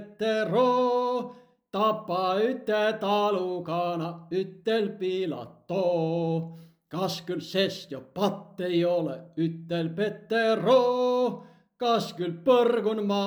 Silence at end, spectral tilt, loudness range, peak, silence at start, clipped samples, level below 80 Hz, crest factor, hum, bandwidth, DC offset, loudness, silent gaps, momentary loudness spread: 0 s; -6 dB/octave; 4 LU; -10 dBFS; 0 s; under 0.1%; -76 dBFS; 18 dB; none; over 20 kHz; under 0.1%; -27 LUFS; none; 11 LU